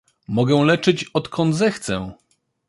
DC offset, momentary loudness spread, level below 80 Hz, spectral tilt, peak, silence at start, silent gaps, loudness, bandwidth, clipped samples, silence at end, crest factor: under 0.1%; 10 LU; -52 dBFS; -6 dB/octave; -2 dBFS; 0.3 s; none; -20 LUFS; 11.5 kHz; under 0.1%; 0.55 s; 18 dB